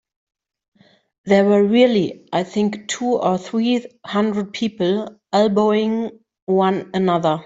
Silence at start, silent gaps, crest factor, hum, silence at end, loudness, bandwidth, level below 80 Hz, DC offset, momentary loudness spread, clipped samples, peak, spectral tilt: 1.25 s; 6.42-6.47 s; 16 dB; none; 0.05 s; -19 LUFS; 7.8 kHz; -62 dBFS; under 0.1%; 10 LU; under 0.1%; -2 dBFS; -6 dB/octave